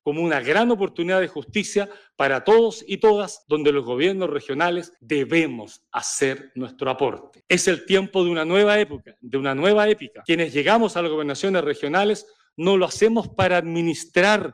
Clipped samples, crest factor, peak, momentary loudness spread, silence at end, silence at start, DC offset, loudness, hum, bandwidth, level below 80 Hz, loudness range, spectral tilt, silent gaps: under 0.1%; 14 dB; -8 dBFS; 9 LU; 0 s; 0.05 s; under 0.1%; -21 LUFS; none; 12.5 kHz; -60 dBFS; 3 LU; -4.5 dB/octave; none